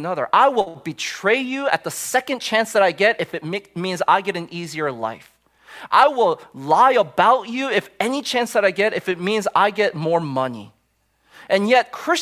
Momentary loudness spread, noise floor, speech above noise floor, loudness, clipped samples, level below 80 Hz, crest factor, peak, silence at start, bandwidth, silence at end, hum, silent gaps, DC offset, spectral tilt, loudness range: 11 LU; -66 dBFS; 46 dB; -19 LUFS; under 0.1%; -66 dBFS; 18 dB; 0 dBFS; 0 s; 16 kHz; 0 s; none; none; under 0.1%; -4 dB/octave; 3 LU